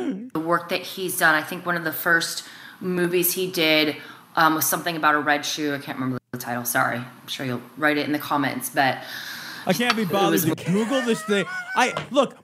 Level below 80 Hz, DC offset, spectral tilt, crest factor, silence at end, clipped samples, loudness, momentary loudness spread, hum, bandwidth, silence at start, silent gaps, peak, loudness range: -72 dBFS; under 0.1%; -3.5 dB/octave; 20 dB; 0.1 s; under 0.1%; -23 LUFS; 11 LU; none; 16 kHz; 0 s; none; -2 dBFS; 3 LU